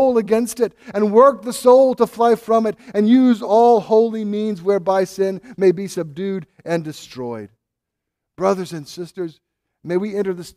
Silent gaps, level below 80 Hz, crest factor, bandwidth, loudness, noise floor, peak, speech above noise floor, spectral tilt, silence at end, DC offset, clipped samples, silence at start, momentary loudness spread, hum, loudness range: none; -62 dBFS; 16 dB; 15 kHz; -17 LUFS; -81 dBFS; 0 dBFS; 64 dB; -6 dB/octave; 0.05 s; under 0.1%; under 0.1%; 0 s; 16 LU; none; 12 LU